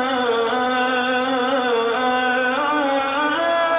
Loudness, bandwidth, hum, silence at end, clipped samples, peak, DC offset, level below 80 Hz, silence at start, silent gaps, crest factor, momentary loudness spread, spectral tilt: -19 LUFS; 4 kHz; none; 0 s; under 0.1%; -8 dBFS; under 0.1%; -58 dBFS; 0 s; none; 10 dB; 1 LU; -7 dB/octave